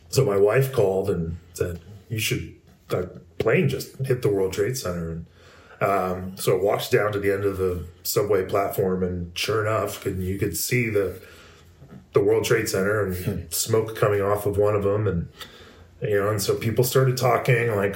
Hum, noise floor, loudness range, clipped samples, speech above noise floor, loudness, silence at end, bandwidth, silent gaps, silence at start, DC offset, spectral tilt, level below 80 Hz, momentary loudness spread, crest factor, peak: none; -49 dBFS; 3 LU; under 0.1%; 26 dB; -24 LUFS; 0 s; 16.5 kHz; none; 0.1 s; under 0.1%; -5 dB/octave; -50 dBFS; 10 LU; 18 dB; -6 dBFS